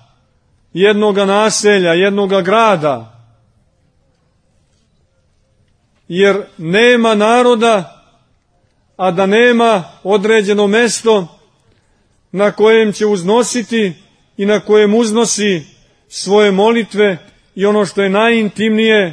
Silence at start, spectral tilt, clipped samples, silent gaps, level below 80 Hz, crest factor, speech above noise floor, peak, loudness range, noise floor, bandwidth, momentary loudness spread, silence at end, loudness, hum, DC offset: 0.75 s; -4 dB/octave; under 0.1%; none; -60 dBFS; 14 dB; 46 dB; 0 dBFS; 5 LU; -57 dBFS; 10.5 kHz; 9 LU; 0 s; -12 LUFS; none; under 0.1%